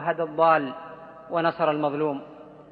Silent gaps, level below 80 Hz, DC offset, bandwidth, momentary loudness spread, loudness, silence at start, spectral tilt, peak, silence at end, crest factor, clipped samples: none; -70 dBFS; under 0.1%; 4.9 kHz; 21 LU; -24 LUFS; 0 s; -9 dB/octave; -6 dBFS; 0.1 s; 20 dB; under 0.1%